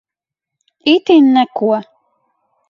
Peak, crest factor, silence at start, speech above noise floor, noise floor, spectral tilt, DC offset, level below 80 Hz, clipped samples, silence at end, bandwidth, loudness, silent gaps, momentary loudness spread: 0 dBFS; 14 dB; 0.85 s; 73 dB; -84 dBFS; -6 dB/octave; under 0.1%; -66 dBFS; under 0.1%; 0.9 s; 7 kHz; -13 LUFS; none; 10 LU